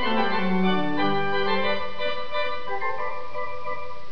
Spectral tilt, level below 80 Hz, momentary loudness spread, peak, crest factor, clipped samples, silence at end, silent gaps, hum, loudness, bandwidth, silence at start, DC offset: -7 dB/octave; -54 dBFS; 10 LU; -10 dBFS; 16 dB; under 0.1%; 0 s; none; none; -27 LUFS; 5.4 kHz; 0 s; 6%